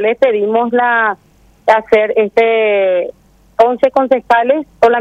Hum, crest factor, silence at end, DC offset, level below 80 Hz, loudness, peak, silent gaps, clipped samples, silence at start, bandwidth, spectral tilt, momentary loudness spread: none; 12 dB; 0 s; under 0.1%; -52 dBFS; -12 LUFS; 0 dBFS; none; under 0.1%; 0 s; 8.4 kHz; -5.5 dB/octave; 7 LU